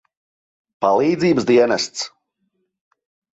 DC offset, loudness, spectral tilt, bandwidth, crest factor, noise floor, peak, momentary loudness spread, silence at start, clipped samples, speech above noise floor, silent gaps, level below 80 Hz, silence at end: under 0.1%; -17 LUFS; -5 dB/octave; 8 kHz; 18 dB; -71 dBFS; -2 dBFS; 11 LU; 0.8 s; under 0.1%; 55 dB; none; -60 dBFS; 1.25 s